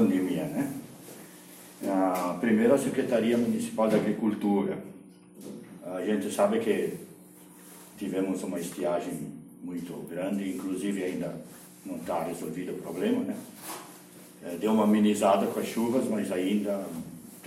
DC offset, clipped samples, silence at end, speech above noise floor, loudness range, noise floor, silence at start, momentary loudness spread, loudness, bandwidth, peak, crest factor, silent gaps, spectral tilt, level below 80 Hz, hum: under 0.1%; under 0.1%; 0 s; 23 dB; 7 LU; -51 dBFS; 0 s; 21 LU; -29 LUFS; 16 kHz; -10 dBFS; 20 dB; none; -6 dB/octave; -70 dBFS; none